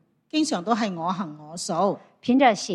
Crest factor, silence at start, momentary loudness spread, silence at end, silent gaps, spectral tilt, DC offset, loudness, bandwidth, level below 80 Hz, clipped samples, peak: 20 dB; 0.35 s; 12 LU; 0 s; none; -4.5 dB/octave; under 0.1%; -24 LUFS; 12 kHz; -72 dBFS; under 0.1%; -4 dBFS